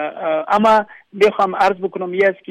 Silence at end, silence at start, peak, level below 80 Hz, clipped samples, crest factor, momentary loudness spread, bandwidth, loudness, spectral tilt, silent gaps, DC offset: 0.15 s; 0 s; -4 dBFS; -56 dBFS; under 0.1%; 12 dB; 9 LU; 12 kHz; -16 LUFS; -5.5 dB/octave; none; under 0.1%